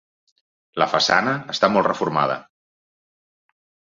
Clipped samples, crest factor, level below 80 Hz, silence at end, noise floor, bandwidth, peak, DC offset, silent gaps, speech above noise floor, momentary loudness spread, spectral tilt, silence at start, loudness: under 0.1%; 22 dB; -64 dBFS; 1.55 s; under -90 dBFS; 7.8 kHz; -2 dBFS; under 0.1%; none; over 70 dB; 8 LU; -4 dB/octave; 0.75 s; -20 LUFS